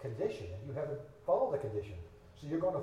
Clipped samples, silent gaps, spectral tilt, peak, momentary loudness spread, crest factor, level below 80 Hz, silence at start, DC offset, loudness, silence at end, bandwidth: under 0.1%; none; -8 dB/octave; -18 dBFS; 17 LU; 18 dB; -62 dBFS; 0 s; under 0.1%; -37 LUFS; 0 s; 11 kHz